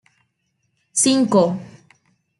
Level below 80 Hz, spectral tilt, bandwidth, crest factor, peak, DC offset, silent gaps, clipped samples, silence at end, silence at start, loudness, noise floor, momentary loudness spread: -66 dBFS; -4 dB/octave; 11.5 kHz; 18 dB; -4 dBFS; under 0.1%; none; under 0.1%; 0.7 s; 0.95 s; -17 LUFS; -71 dBFS; 10 LU